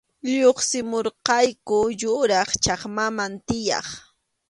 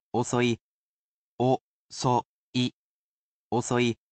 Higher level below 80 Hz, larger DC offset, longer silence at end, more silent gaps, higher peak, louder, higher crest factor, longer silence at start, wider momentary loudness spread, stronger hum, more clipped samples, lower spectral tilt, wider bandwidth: first, -52 dBFS vs -64 dBFS; neither; first, 0.5 s vs 0.2 s; second, none vs 0.61-1.38 s, 1.61-1.89 s, 2.25-2.53 s, 2.73-3.51 s; first, 0 dBFS vs -12 dBFS; first, -22 LUFS vs -28 LUFS; about the same, 22 dB vs 18 dB; about the same, 0.25 s vs 0.15 s; about the same, 8 LU vs 7 LU; neither; neither; second, -2.5 dB/octave vs -5 dB/octave; first, 11.5 kHz vs 8.8 kHz